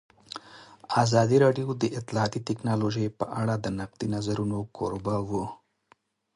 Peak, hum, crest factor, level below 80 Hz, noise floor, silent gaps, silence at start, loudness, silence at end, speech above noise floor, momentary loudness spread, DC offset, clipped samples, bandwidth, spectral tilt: -8 dBFS; none; 20 dB; -56 dBFS; -65 dBFS; none; 0.3 s; -27 LUFS; 0.8 s; 38 dB; 16 LU; under 0.1%; under 0.1%; 11.5 kHz; -6.5 dB/octave